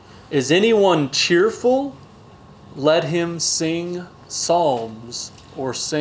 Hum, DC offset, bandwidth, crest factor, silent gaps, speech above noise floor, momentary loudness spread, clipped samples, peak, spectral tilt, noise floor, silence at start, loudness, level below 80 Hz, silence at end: none; under 0.1%; 8 kHz; 16 dB; none; 25 dB; 14 LU; under 0.1%; -4 dBFS; -3.5 dB/octave; -44 dBFS; 0.1 s; -19 LUFS; -56 dBFS; 0 s